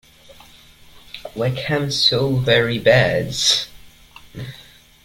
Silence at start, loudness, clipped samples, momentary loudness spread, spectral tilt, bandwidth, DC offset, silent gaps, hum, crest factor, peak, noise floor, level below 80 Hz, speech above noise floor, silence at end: 0.95 s; -17 LUFS; under 0.1%; 20 LU; -4 dB/octave; 16.5 kHz; under 0.1%; none; none; 18 dB; -2 dBFS; -46 dBFS; -48 dBFS; 29 dB; 0.45 s